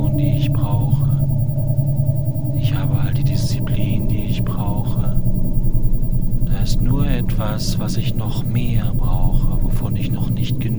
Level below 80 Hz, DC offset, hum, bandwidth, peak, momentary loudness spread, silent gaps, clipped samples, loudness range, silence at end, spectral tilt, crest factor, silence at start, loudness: -20 dBFS; 5%; none; over 20 kHz; -2 dBFS; 4 LU; none; under 0.1%; 2 LU; 0 s; -7.5 dB/octave; 12 dB; 0 s; -20 LUFS